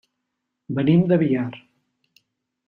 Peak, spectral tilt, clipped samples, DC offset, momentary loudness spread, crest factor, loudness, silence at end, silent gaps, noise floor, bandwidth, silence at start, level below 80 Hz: -6 dBFS; -10.5 dB/octave; under 0.1%; under 0.1%; 13 LU; 18 dB; -20 LUFS; 1.1 s; none; -79 dBFS; 4.3 kHz; 0.7 s; -62 dBFS